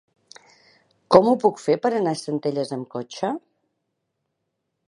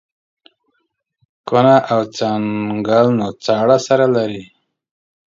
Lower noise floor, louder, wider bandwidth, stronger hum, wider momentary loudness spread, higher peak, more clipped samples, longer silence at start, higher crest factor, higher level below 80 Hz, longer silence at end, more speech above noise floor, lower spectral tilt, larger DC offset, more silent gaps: first, -78 dBFS vs -69 dBFS; second, -22 LUFS vs -15 LUFS; first, 11 kHz vs 7.8 kHz; neither; first, 14 LU vs 9 LU; about the same, 0 dBFS vs 0 dBFS; neither; second, 1.1 s vs 1.45 s; first, 24 dB vs 16 dB; second, -66 dBFS vs -60 dBFS; first, 1.5 s vs 0.85 s; about the same, 57 dB vs 55 dB; about the same, -6 dB/octave vs -6 dB/octave; neither; neither